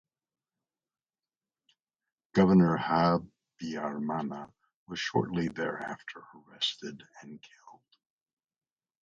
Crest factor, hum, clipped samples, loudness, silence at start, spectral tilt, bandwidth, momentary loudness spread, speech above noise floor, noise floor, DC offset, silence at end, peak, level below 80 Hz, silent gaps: 22 dB; none; under 0.1%; -29 LUFS; 2.35 s; -6.5 dB/octave; 7.6 kHz; 25 LU; over 60 dB; under -90 dBFS; under 0.1%; 1.3 s; -12 dBFS; -62 dBFS; 4.75-4.86 s